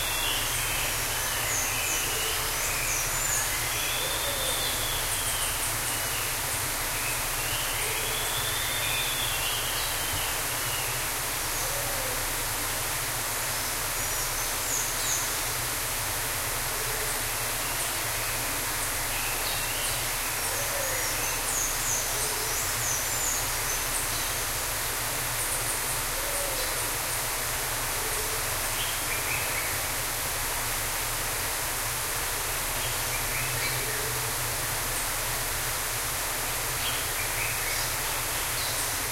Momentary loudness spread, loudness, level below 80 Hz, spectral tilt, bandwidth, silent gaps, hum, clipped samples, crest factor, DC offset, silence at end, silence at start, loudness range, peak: 2 LU; -27 LUFS; -42 dBFS; -1 dB/octave; 16 kHz; none; none; under 0.1%; 16 dB; under 0.1%; 0 s; 0 s; 2 LU; -14 dBFS